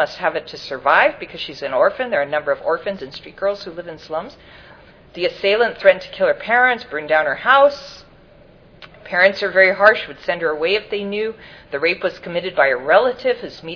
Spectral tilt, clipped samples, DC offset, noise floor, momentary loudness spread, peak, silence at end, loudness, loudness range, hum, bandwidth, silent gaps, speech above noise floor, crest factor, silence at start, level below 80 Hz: -4.5 dB/octave; under 0.1%; under 0.1%; -47 dBFS; 15 LU; 0 dBFS; 0 s; -18 LUFS; 6 LU; none; 5.4 kHz; none; 29 dB; 18 dB; 0 s; -54 dBFS